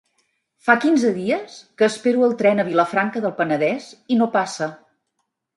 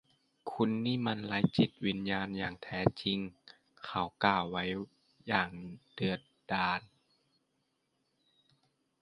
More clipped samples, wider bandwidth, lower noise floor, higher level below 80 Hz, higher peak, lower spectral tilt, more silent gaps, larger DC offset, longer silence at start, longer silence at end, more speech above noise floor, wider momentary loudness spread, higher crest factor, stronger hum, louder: neither; about the same, 11.5 kHz vs 10.5 kHz; second, -75 dBFS vs -80 dBFS; second, -72 dBFS vs -62 dBFS; first, 0 dBFS vs -8 dBFS; second, -5.5 dB/octave vs -7.5 dB/octave; neither; neither; first, 0.65 s vs 0.45 s; second, 0.8 s vs 2.15 s; first, 56 dB vs 46 dB; second, 9 LU vs 15 LU; second, 20 dB vs 28 dB; neither; first, -20 LUFS vs -34 LUFS